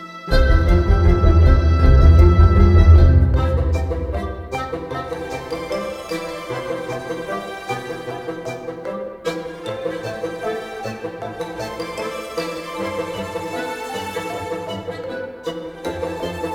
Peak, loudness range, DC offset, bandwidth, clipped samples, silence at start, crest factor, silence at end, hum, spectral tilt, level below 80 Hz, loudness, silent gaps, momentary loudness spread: -2 dBFS; 14 LU; under 0.1%; 11.5 kHz; under 0.1%; 0 s; 16 dB; 0 s; none; -7.5 dB/octave; -22 dBFS; -20 LUFS; none; 16 LU